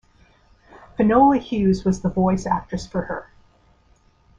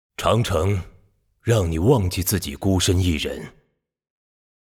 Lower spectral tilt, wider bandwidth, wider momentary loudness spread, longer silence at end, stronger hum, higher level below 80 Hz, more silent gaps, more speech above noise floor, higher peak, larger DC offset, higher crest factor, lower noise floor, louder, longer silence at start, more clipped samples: first, -7.5 dB/octave vs -5.5 dB/octave; second, 7.8 kHz vs 18 kHz; first, 14 LU vs 10 LU; about the same, 1.15 s vs 1.15 s; neither; second, -44 dBFS vs -38 dBFS; neither; about the same, 38 dB vs 38 dB; about the same, -4 dBFS vs -4 dBFS; neither; about the same, 18 dB vs 18 dB; about the same, -57 dBFS vs -58 dBFS; about the same, -20 LUFS vs -21 LUFS; first, 1 s vs 0.2 s; neither